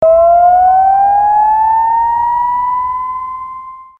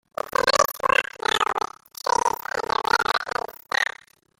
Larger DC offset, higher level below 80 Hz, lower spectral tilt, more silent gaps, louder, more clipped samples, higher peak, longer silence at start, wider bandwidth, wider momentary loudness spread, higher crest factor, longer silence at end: neither; first, -42 dBFS vs -56 dBFS; first, -7 dB/octave vs -1 dB/octave; neither; first, -10 LUFS vs -23 LUFS; neither; about the same, 0 dBFS vs -2 dBFS; second, 0 s vs 0.25 s; second, 3.2 kHz vs 17 kHz; first, 15 LU vs 9 LU; second, 10 dB vs 22 dB; second, 0.15 s vs 0.55 s